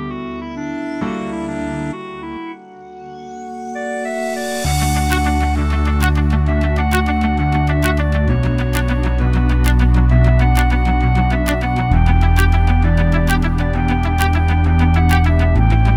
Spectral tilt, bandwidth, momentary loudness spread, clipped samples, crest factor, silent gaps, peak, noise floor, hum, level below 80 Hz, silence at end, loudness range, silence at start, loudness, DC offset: -6.5 dB/octave; 17 kHz; 13 LU; under 0.1%; 14 dB; none; 0 dBFS; -36 dBFS; none; -18 dBFS; 0 s; 11 LU; 0 s; -16 LUFS; under 0.1%